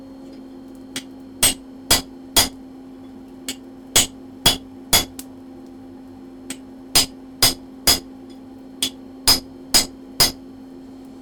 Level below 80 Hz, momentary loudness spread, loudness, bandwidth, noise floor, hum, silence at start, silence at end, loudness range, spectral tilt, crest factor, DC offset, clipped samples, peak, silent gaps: -42 dBFS; 23 LU; -18 LUFS; 19.5 kHz; -39 dBFS; none; 0 s; 0 s; 2 LU; -1 dB/octave; 24 dB; under 0.1%; under 0.1%; 0 dBFS; none